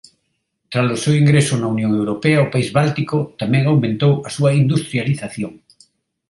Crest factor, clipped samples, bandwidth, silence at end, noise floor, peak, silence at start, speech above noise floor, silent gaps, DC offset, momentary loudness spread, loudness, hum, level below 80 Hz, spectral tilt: 16 dB; under 0.1%; 11.5 kHz; 0.75 s; -71 dBFS; -2 dBFS; 0.7 s; 55 dB; none; under 0.1%; 8 LU; -17 LUFS; none; -54 dBFS; -6.5 dB/octave